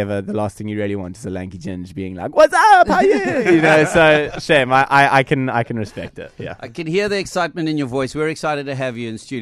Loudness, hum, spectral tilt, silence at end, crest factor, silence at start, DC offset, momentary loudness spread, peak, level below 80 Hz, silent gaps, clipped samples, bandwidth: -16 LUFS; none; -5.5 dB/octave; 0 s; 16 dB; 0 s; under 0.1%; 17 LU; -2 dBFS; -46 dBFS; none; under 0.1%; 13 kHz